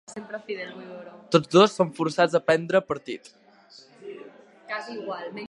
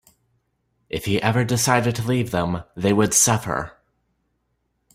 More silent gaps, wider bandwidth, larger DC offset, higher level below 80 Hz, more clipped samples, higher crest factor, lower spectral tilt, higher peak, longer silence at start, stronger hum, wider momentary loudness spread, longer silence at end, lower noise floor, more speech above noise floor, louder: neither; second, 11.5 kHz vs 16 kHz; neither; second, -70 dBFS vs -50 dBFS; neither; about the same, 22 dB vs 20 dB; first, -5.5 dB/octave vs -4 dB/octave; about the same, -4 dBFS vs -2 dBFS; second, 0.1 s vs 0.95 s; neither; first, 23 LU vs 12 LU; second, 0.05 s vs 1.25 s; second, -53 dBFS vs -72 dBFS; second, 28 dB vs 51 dB; second, -24 LUFS vs -20 LUFS